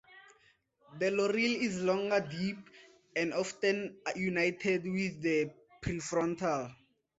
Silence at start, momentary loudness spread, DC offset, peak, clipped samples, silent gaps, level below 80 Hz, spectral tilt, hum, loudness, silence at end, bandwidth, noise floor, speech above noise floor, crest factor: 0.1 s; 9 LU; under 0.1%; -16 dBFS; under 0.1%; none; -64 dBFS; -5 dB/octave; none; -33 LUFS; 0.45 s; 8 kHz; -69 dBFS; 36 dB; 18 dB